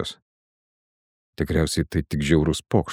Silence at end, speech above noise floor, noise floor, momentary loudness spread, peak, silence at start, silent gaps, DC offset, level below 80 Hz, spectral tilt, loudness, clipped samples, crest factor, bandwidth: 0 s; over 68 dB; under -90 dBFS; 8 LU; -4 dBFS; 0 s; 0.22-1.33 s; under 0.1%; -38 dBFS; -6 dB/octave; -23 LUFS; under 0.1%; 20 dB; 16 kHz